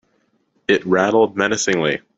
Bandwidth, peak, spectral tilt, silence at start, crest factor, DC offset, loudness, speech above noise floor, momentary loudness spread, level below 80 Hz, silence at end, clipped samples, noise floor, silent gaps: 8 kHz; -2 dBFS; -4 dB/octave; 0.7 s; 16 dB; under 0.1%; -17 LUFS; 47 dB; 4 LU; -58 dBFS; 0.2 s; under 0.1%; -64 dBFS; none